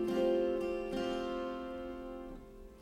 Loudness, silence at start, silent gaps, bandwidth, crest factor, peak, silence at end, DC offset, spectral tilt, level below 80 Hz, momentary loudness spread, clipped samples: -37 LUFS; 0 s; none; 13.5 kHz; 16 dB; -22 dBFS; 0 s; under 0.1%; -6 dB/octave; -56 dBFS; 17 LU; under 0.1%